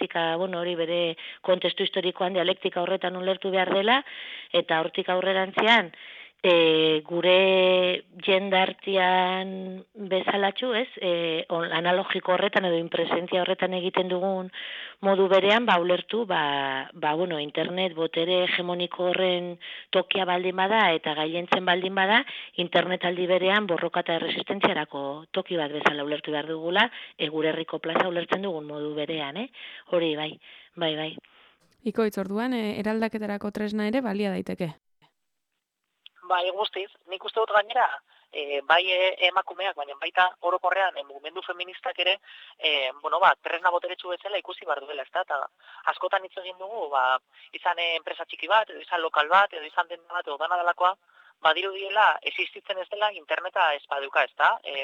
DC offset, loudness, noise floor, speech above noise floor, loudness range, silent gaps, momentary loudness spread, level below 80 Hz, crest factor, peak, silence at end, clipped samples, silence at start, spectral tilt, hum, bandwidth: under 0.1%; -25 LUFS; -81 dBFS; 56 dB; 7 LU; none; 12 LU; -76 dBFS; 20 dB; -6 dBFS; 0 s; under 0.1%; 0 s; -5.5 dB/octave; none; 13 kHz